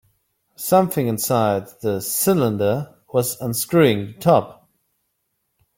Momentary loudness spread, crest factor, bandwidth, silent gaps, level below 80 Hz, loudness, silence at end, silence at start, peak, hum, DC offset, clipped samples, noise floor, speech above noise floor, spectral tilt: 8 LU; 20 dB; 17 kHz; none; -58 dBFS; -20 LUFS; 1.25 s; 0.6 s; -2 dBFS; none; under 0.1%; under 0.1%; -73 dBFS; 54 dB; -5 dB/octave